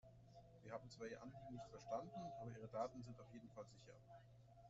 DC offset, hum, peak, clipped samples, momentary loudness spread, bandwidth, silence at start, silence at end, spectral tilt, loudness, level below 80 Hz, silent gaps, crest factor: under 0.1%; none; -34 dBFS; under 0.1%; 16 LU; 7.6 kHz; 0.05 s; 0 s; -6 dB/octave; -54 LUFS; -76 dBFS; none; 22 dB